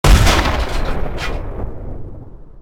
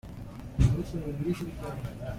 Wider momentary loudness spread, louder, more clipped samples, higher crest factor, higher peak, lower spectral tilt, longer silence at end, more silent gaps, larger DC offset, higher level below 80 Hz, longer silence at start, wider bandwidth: first, 21 LU vs 14 LU; first, -18 LUFS vs -31 LUFS; neither; about the same, 16 dB vs 20 dB; first, 0 dBFS vs -10 dBFS; second, -4.5 dB/octave vs -8 dB/octave; about the same, 0 s vs 0 s; neither; neither; first, -18 dBFS vs -38 dBFS; about the same, 0.05 s vs 0.05 s; about the same, 16 kHz vs 15.5 kHz